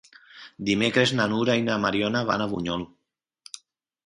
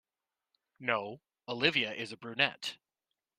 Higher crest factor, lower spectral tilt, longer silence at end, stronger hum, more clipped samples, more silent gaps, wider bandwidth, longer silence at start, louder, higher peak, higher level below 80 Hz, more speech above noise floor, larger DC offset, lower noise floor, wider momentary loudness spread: about the same, 22 dB vs 26 dB; first, -5 dB/octave vs -3.5 dB/octave; first, 1.2 s vs 0.65 s; neither; neither; neither; second, 11.5 kHz vs 15 kHz; second, 0.35 s vs 0.8 s; first, -24 LUFS vs -33 LUFS; first, -6 dBFS vs -10 dBFS; first, -58 dBFS vs -78 dBFS; second, 30 dB vs over 56 dB; neither; second, -54 dBFS vs under -90 dBFS; first, 21 LU vs 14 LU